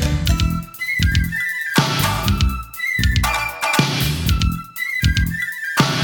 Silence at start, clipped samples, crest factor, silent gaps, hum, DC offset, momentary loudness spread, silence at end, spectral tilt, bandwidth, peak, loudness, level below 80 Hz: 0 s; under 0.1%; 18 dB; none; none; under 0.1%; 5 LU; 0 s; -4 dB/octave; over 20 kHz; 0 dBFS; -19 LUFS; -24 dBFS